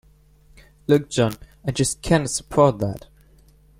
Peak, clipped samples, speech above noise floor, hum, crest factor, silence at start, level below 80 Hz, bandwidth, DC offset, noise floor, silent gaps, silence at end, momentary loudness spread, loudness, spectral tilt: -2 dBFS; under 0.1%; 33 dB; none; 20 dB; 0.9 s; -44 dBFS; 16.5 kHz; under 0.1%; -53 dBFS; none; 0.8 s; 12 LU; -21 LUFS; -5 dB/octave